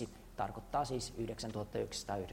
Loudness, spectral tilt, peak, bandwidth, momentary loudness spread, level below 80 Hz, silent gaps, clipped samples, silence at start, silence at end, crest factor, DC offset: -41 LUFS; -4.5 dB/octave; -24 dBFS; 16 kHz; 5 LU; -56 dBFS; none; under 0.1%; 0 s; 0 s; 18 dB; under 0.1%